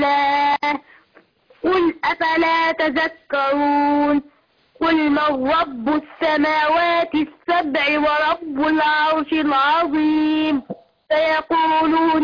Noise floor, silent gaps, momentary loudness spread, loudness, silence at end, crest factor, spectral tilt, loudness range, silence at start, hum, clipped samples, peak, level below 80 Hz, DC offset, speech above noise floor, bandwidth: -56 dBFS; none; 6 LU; -18 LUFS; 0 s; 10 dB; -5.5 dB/octave; 1 LU; 0 s; none; under 0.1%; -10 dBFS; -54 dBFS; under 0.1%; 38 dB; 5.2 kHz